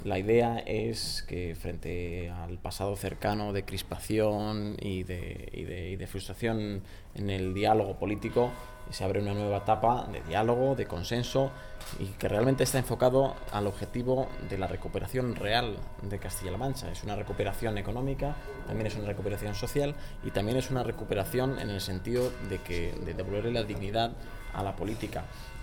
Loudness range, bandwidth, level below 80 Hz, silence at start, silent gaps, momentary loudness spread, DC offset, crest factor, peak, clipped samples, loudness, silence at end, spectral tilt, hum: 5 LU; 20 kHz; -44 dBFS; 0 s; none; 12 LU; under 0.1%; 20 dB; -12 dBFS; under 0.1%; -32 LUFS; 0 s; -5.5 dB/octave; none